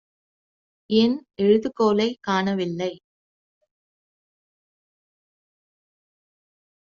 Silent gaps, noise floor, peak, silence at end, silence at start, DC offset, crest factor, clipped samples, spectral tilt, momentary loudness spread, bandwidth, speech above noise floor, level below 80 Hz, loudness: none; under -90 dBFS; -6 dBFS; 4 s; 0.9 s; under 0.1%; 20 dB; under 0.1%; -4.5 dB/octave; 7 LU; 7.2 kHz; over 69 dB; -66 dBFS; -22 LUFS